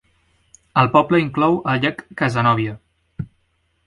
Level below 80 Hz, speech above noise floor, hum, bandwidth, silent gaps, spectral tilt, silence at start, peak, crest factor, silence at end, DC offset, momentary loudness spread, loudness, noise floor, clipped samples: -52 dBFS; 48 dB; none; 11.5 kHz; none; -7 dB/octave; 0.75 s; 0 dBFS; 20 dB; 0.6 s; under 0.1%; 19 LU; -18 LUFS; -66 dBFS; under 0.1%